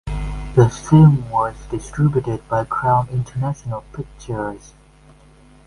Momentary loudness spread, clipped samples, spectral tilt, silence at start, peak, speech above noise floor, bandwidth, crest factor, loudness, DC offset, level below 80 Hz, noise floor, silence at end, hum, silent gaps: 17 LU; under 0.1%; -8.5 dB/octave; 0.05 s; 0 dBFS; 30 dB; 11 kHz; 18 dB; -19 LUFS; under 0.1%; -36 dBFS; -48 dBFS; 1.1 s; none; none